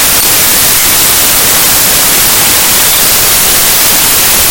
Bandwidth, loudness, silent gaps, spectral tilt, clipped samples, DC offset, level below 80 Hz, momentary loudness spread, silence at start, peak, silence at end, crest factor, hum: over 20 kHz; -3 LUFS; none; 0 dB/octave; 4%; 2%; -28 dBFS; 0 LU; 0 s; 0 dBFS; 0 s; 6 dB; none